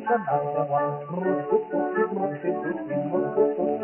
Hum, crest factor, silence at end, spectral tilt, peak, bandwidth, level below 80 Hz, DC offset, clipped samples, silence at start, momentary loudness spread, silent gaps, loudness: none; 14 dB; 0 s; -8 dB/octave; -10 dBFS; 3.1 kHz; -68 dBFS; under 0.1%; under 0.1%; 0 s; 5 LU; none; -26 LUFS